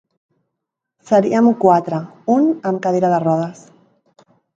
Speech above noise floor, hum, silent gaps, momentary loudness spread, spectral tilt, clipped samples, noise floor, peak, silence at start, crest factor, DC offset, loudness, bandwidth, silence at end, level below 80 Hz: 64 dB; none; none; 9 LU; -8 dB/octave; under 0.1%; -80 dBFS; 0 dBFS; 1.1 s; 18 dB; under 0.1%; -16 LUFS; 7.6 kHz; 1.05 s; -66 dBFS